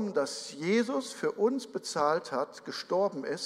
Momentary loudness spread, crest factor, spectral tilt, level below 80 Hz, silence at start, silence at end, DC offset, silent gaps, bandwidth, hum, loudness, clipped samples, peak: 6 LU; 18 dB; -4 dB/octave; -80 dBFS; 0 s; 0 s; under 0.1%; none; 14.5 kHz; none; -31 LUFS; under 0.1%; -14 dBFS